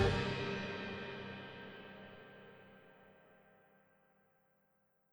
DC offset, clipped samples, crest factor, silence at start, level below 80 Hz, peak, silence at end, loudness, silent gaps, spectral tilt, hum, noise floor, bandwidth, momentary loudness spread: under 0.1%; under 0.1%; 24 dB; 0 s; -58 dBFS; -20 dBFS; 1.75 s; -42 LUFS; none; -6 dB/octave; 50 Hz at -80 dBFS; -77 dBFS; over 20 kHz; 23 LU